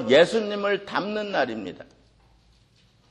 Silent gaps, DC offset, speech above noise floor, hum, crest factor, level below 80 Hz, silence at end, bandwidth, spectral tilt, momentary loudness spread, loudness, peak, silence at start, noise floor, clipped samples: none; under 0.1%; 37 dB; none; 22 dB; -62 dBFS; 1.25 s; 11 kHz; -4.5 dB/octave; 18 LU; -24 LUFS; -4 dBFS; 0 s; -60 dBFS; under 0.1%